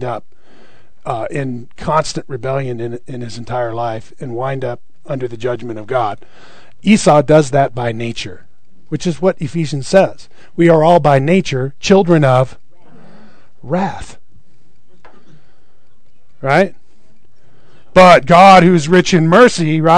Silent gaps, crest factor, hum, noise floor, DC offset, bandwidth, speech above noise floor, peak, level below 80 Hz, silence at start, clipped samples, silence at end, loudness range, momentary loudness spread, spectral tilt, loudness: none; 14 dB; none; -57 dBFS; 4%; 12 kHz; 45 dB; 0 dBFS; -44 dBFS; 0 s; 1%; 0 s; 12 LU; 18 LU; -6 dB/octave; -13 LUFS